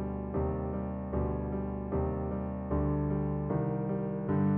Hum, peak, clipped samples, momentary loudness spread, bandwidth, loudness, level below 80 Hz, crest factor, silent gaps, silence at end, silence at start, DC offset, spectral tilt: none; -20 dBFS; under 0.1%; 4 LU; 3.2 kHz; -33 LUFS; -42 dBFS; 12 dB; none; 0 s; 0 s; under 0.1%; -11.5 dB/octave